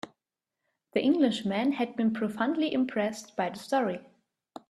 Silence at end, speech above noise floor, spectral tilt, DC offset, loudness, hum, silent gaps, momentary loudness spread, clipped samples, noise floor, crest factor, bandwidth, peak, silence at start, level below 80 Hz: 0.7 s; 60 dB; -5.5 dB/octave; under 0.1%; -29 LUFS; none; none; 8 LU; under 0.1%; -88 dBFS; 18 dB; 12.5 kHz; -12 dBFS; 0.05 s; -74 dBFS